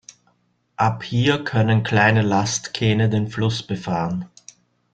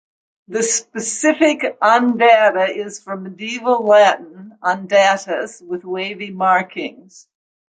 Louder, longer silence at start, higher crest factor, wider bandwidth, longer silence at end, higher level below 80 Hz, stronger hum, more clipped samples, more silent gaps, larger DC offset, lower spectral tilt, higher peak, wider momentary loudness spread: second, -20 LUFS vs -16 LUFS; first, 0.8 s vs 0.5 s; about the same, 18 dB vs 16 dB; about the same, 8.8 kHz vs 9.6 kHz; second, 0.65 s vs 0.8 s; first, -52 dBFS vs -72 dBFS; first, 60 Hz at -40 dBFS vs none; neither; neither; neither; first, -5.5 dB/octave vs -3 dB/octave; about the same, -2 dBFS vs -2 dBFS; second, 9 LU vs 15 LU